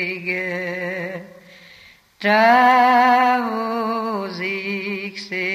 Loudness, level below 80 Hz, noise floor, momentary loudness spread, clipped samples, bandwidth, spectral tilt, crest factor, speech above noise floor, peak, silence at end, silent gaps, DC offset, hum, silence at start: -18 LUFS; -70 dBFS; -48 dBFS; 14 LU; under 0.1%; 15 kHz; -5 dB/octave; 16 dB; 32 dB; -4 dBFS; 0 s; none; under 0.1%; none; 0 s